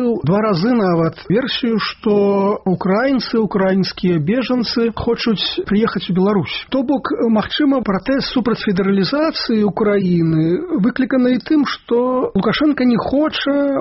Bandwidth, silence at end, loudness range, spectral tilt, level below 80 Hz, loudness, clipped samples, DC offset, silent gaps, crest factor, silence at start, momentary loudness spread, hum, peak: 6 kHz; 0 s; 1 LU; -5 dB/octave; -44 dBFS; -16 LUFS; under 0.1%; under 0.1%; none; 12 dB; 0 s; 3 LU; none; -4 dBFS